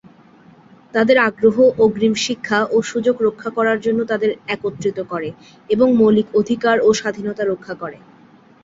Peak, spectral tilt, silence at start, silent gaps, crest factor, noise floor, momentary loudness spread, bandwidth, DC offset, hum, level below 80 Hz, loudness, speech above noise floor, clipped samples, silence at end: -2 dBFS; -5 dB/octave; 0.95 s; none; 16 dB; -48 dBFS; 11 LU; 7.8 kHz; under 0.1%; none; -58 dBFS; -17 LUFS; 31 dB; under 0.1%; 0.65 s